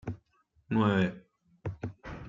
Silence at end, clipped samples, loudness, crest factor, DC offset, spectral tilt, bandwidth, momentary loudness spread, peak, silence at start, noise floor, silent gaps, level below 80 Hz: 0 s; under 0.1%; -31 LUFS; 20 dB; under 0.1%; -8 dB/octave; 7.4 kHz; 18 LU; -14 dBFS; 0.05 s; -70 dBFS; none; -58 dBFS